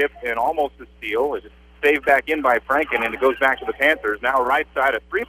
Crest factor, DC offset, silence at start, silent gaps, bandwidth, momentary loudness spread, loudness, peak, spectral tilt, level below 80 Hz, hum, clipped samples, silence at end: 18 dB; under 0.1%; 0 s; none; 15.5 kHz; 7 LU; -20 LUFS; -2 dBFS; -4 dB/octave; -48 dBFS; none; under 0.1%; 0.05 s